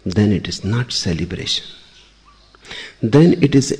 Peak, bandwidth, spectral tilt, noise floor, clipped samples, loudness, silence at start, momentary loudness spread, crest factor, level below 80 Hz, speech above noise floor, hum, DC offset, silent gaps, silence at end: -2 dBFS; 10 kHz; -5.5 dB/octave; -49 dBFS; under 0.1%; -17 LUFS; 0.05 s; 20 LU; 16 dB; -42 dBFS; 33 dB; none; under 0.1%; none; 0 s